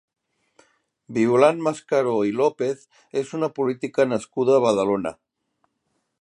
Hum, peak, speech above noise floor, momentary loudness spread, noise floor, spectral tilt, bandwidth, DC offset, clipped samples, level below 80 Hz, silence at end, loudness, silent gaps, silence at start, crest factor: none; -2 dBFS; 53 dB; 11 LU; -74 dBFS; -6 dB/octave; 11 kHz; under 0.1%; under 0.1%; -66 dBFS; 1.1 s; -22 LUFS; none; 1.1 s; 20 dB